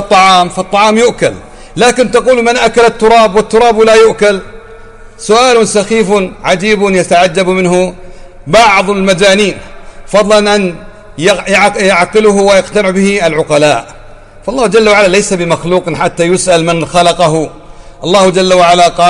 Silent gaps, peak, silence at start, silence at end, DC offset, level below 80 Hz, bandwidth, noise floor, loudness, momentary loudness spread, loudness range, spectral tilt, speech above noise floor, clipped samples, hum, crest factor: none; 0 dBFS; 0 s; 0 s; under 0.1%; -34 dBFS; 11.5 kHz; -32 dBFS; -8 LUFS; 8 LU; 2 LU; -4 dB/octave; 24 dB; 0.3%; none; 8 dB